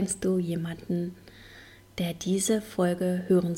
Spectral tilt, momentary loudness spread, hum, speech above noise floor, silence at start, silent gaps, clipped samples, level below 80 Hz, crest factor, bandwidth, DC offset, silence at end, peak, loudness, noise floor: -5.5 dB/octave; 23 LU; none; 23 dB; 0 s; none; under 0.1%; -58 dBFS; 16 dB; 16.5 kHz; under 0.1%; 0 s; -12 dBFS; -28 LUFS; -51 dBFS